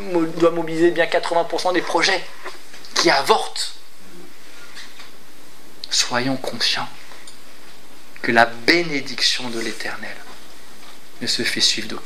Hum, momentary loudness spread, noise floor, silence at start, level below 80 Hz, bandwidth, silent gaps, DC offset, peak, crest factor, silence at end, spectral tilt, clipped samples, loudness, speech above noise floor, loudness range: none; 21 LU; -46 dBFS; 0 s; -66 dBFS; 16 kHz; none; 5%; 0 dBFS; 22 dB; 0 s; -2.5 dB/octave; under 0.1%; -19 LUFS; 26 dB; 5 LU